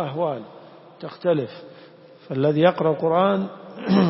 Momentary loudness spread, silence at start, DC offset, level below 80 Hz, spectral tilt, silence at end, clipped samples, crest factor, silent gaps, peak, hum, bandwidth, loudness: 20 LU; 0 s; under 0.1%; -66 dBFS; -11 dB/octave; 0 s; under 0.1%; 20 dB; none; -4 dBFS; none; 5.8 kHz; -22 LUFS